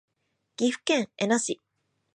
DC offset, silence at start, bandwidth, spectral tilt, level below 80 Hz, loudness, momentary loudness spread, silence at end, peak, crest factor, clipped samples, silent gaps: under 0.1%; 0.6 s; 11 kHz; -3 dB/octave; -78 dBFS; -27 LUFS; 11 LU; 0.6 s; -12 dBFS; 16 dB; under 0.1%; none